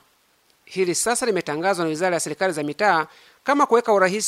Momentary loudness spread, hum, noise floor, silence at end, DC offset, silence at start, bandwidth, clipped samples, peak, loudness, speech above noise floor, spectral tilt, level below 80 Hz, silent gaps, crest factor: 7 LU; none; -62 dBFS; 0 s; under 0.1%; 0.7 s; 16 kHz; under 0.1%; -4 dBFS; -21 LUFS; 41 dB; -3.5 dB/octave; -68 dBFS; none; 18 dB